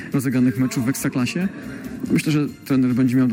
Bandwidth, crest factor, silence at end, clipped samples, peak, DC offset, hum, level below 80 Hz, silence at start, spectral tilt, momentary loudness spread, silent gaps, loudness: 17 kHz; 12 dB; 0 s; under 0.1%; -8 dBFS; under 0.1%; none; -54 dBFS; 0 s; -6 dB/octave; 10 LU; none; -21 LUFS